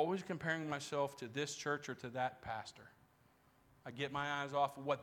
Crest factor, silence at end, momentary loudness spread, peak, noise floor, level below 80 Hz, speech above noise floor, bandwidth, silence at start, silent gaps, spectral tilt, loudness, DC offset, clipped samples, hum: 20 dB; 0 s; 10 LU; -22 dBFS; -71 dBFS; -74 dBFS; 30 dB; 17 kHz; 0 s; none; -4.5 dB/octave; -41 LUFS; under 0.1%; under 0.1%; none